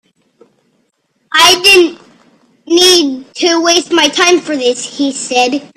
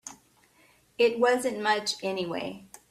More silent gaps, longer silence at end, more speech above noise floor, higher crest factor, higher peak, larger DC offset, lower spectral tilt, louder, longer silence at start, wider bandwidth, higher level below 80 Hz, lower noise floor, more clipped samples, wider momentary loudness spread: neither; second, 0.1 s vs 0.25 s; first, 50 dB vs 35 dB; second, 12 dB vs 18 dB; first, 0 dBFS vs -12 dBFS; neither; second, -0.5 dB/octave vs -3 dB/octave; first, -9 LUFS vs -27 LUFS; first, 1.3 s vs 0.05 s; first, 16 kHz vs 14.5 kHz; first, -52 dBFS vs -72 dBFS; about the same, -61 dBFS vs -62 dBFS; first, 0.2% vs under 0.1%; second, 10 LU vs 16 LU